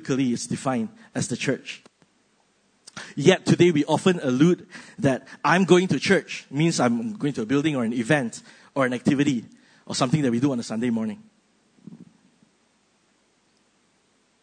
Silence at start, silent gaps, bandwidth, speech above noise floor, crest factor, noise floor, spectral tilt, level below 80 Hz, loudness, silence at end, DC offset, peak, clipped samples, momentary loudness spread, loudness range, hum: 0 s; none; 9.6 kHz; 43 dB; 22 dB; -65 dBFS; -5.5 dB/octave; -66 dBFS; -23 LUFS; 2.4 s; under 0.1%; -2 dBFS; under 0.1%; 14 LU; 8 LU; none